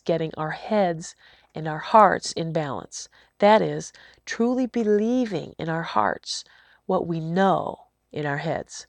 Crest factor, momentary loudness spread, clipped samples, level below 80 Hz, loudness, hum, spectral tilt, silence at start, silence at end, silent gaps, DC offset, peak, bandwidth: 22 dB; 19 LU; under 0.1%; -62 dBFS; -24 LUFS; none; -5.5 dB/octave; 0.05 s; 0.05 s; none; under 0.1%; -2 dBFS; 10.5 kHz